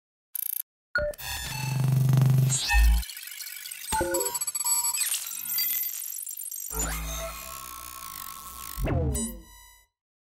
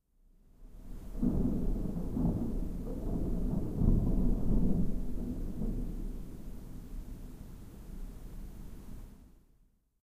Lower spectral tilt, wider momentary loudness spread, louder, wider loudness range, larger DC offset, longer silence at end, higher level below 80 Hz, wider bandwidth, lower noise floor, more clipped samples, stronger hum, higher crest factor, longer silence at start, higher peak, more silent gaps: second, -3.5 dB/octave vs -9.5 dB/octave; second, 14 LU vs 19 LU; first, -28 LUFS vs -35 LUFS; second, 8 LU vs 15 LU; neither; about the same, 0.65 s vs 0.75 s; about the same, -34 dBFS vs -36 dBFS; about the same, 16.5 kHz vs 15 kHz; second, -54 dBFS vs -68 dBFS; neither; neither; about the same, 16 dB vs 20 dB; second, 0.35 s vs 0.6 s; about the same, -12 dBFS vs -12 dBFS; first, 0.63-0.94 s vs none